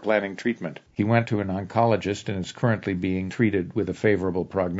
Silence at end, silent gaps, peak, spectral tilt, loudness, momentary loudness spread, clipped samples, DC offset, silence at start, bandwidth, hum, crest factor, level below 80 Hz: 0 s; none; -4 dBFS; -7 dB/octave; -25 LUFS; 6 LU; under 0.1%; under 0.1%; 0 s; 7.8 kHz; none; 20 dB; -58 dBFS